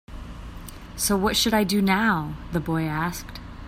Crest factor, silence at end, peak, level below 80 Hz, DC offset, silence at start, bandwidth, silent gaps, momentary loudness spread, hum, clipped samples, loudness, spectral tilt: 18 dB; 0 s; -6 dBFS; -40 dBFS; under 0.1%; 0.1 s; 16 kHz; none; 19 LU; none; under 0.1%; -23 LUFS; -4 dB/octave